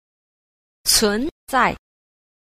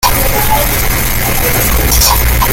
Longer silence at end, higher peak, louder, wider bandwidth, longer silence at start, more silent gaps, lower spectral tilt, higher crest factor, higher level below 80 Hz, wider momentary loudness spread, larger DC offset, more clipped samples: first, 0.75 s vs 0 s; second, -4 dBFS vs 0 dBFS; second, -19 LUFS vs -10 LUFS; second, 15.5 kHz vs 17.5 kHz; first, 0.85 s vs 0 s; first, 1.31-1.47 s vs none; second, -1.5 dB/octave vs -3 dB/octave; first, 20 dB vs 10 dB; second, -44 dBFS vs -16 dBFS; first, 9 LU vs 4 LU; neither; neither